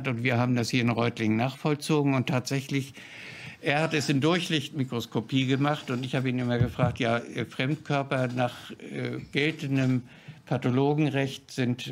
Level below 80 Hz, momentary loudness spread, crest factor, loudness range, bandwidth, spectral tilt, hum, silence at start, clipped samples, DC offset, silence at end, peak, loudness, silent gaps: -58 dBFS; 9 LU; 20 dB; 2 LU; 15.5 kHz; -6 dB/octave; none; 0 s; under 0.1%; under 0.1%; 0 s; -8 dBFS; -27 LUFS; none